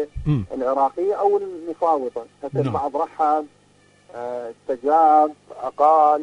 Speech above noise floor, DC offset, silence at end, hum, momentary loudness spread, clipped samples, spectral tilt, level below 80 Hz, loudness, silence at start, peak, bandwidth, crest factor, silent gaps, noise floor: 35 dB; under 0.1%; 0 s; 50 Hz at -55 dBFS; 16 LU; under 0.1%; -8.5 dB/octave; -46 dBFS; -21 LUFS; 0 s; -4 dBFS; 9.8 kHz; 16 dB; none; -56 dBFS